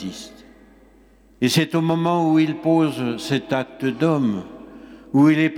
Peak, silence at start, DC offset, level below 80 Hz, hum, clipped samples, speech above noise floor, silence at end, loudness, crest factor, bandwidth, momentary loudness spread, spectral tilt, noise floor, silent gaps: -6 dBFS; 0 s; under 0.1%; -58 dBFS; none; under 0.1%; 33 dB; 0 s; -20 LUFS; 16 dB; 16.5 kHz; 19 LU; -6 dB/octave; -52 dBFS; none